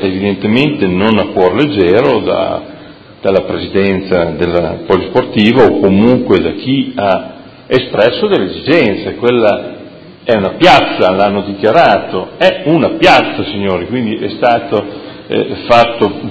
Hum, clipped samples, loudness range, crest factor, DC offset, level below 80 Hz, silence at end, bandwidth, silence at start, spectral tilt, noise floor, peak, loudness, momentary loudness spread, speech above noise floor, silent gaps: none; 0.8%; 3 LU; 12 dB; under 0.1%; -38 dBFS; 0 s; 8 kHz; 0 s; -7 dB/octave; -34 dBFS; 0 dBFS; -11 LUFS; 9 LU; 23 dB; none